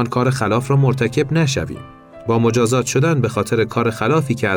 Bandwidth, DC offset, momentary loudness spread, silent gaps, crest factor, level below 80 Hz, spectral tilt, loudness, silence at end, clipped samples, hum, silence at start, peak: 17 kHz; under 0.1%; 5 LU; none; 12 dB; -46 dBFS; -6 dB/octave; -17 LUFS; 0 s; under 0.1%; none; 0 s; -6 dBFS